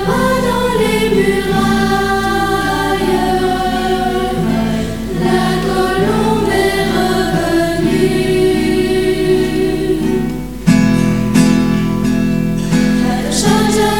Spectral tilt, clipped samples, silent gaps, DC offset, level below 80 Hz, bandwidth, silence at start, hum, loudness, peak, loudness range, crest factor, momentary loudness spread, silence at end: -5.5 dB/octave; under 0.1%; none; 2%; -30 dBFS; 18 kHz; 0 s; none; -14 LUFS; 0 dBFS; 2 LU; 14 dB; 4 LU; 0 s